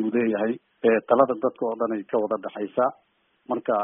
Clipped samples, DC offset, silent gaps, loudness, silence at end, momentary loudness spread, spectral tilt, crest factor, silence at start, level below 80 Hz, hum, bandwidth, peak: under 0.1%; under 0.1%; none; -25 LUFS; 0 s; 9 LU; -1.5 dB/octave; 20 dB; 0 s; -70 dBFS; none; 3.7 kHz; -4 dBFS